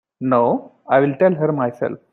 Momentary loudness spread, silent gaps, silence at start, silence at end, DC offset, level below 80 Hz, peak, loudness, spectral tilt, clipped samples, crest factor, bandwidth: 7 LU; none; 0.2 s; 0.15 s; under 0.1%; -64 dBFS; -2 dBFS; -18 LUFS; -10 dB/octave; under 0.1%; 16 dB; 4.2 kHz